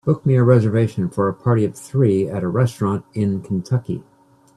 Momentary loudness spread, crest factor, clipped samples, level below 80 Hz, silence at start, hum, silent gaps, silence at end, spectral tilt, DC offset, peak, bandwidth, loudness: 8 LU; 18 dB; under 0.1%; -54 dBFS; 0.05 s; none; none; 0.55 s; -8.5 dB/octave; under 0.1%; 0 dBFS; 12 kHz; -19 LUFS